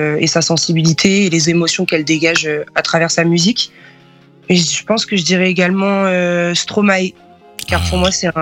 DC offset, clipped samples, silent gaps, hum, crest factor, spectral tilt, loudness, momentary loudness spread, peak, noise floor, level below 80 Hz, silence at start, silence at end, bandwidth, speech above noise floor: under 0.1%; under 0.1%; none; none; 14 dB; -4 dB/octave; -13 LUFS; 5 LU; 0 dBFS; -45 dBFS; -36 dBFS; 0 s; 0 s; 16.5 kHz; 31 dB